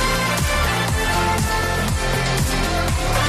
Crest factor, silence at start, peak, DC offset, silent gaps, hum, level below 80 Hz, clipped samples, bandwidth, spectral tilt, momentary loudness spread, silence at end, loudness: 12 dB; 0 s; -8 dBFS; under 0.1%; none; none; -26 dBFS; under 0.1%; 15.5 kHz; -4 dB/octave; 2 LU; 0 s; -20 LUFS